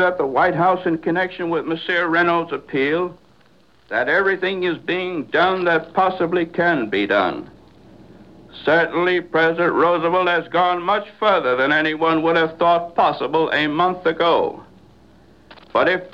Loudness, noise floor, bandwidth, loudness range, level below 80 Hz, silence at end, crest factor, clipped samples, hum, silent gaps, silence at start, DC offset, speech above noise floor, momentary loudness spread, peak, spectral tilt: -19 LUFS; -55 dBFS; 7.2 kHz; 3 LU; -58 dBFS; 0.05 s; 16 dB; under 0.1%; none; none; 0 s; 0.2%; 36 dB; 6 LU; -4 dBFS; -7 dB/octave